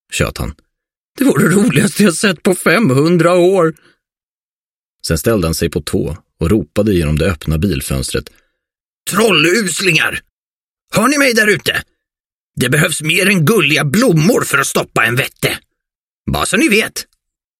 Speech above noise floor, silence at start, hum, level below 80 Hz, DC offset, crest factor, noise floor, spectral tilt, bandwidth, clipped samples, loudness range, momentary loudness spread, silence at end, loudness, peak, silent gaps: over 77 dB; 0.1 s; none; -34 dBFS; under 0.1%; 14 dB; under -90 dBFS; -4.5 dB/octave; 16.5 kHz; under 0.1%; 5 LU; 10 LU; 0.55 s; -13 LUFS; 0 dBFS; 0.97-1.15 s, 4.25-4.96 s, 8.85-9.05 s, 10.30-10.88 s, 12.20-12.30 s, 12.36-12.51 s, 15.97-16.25 s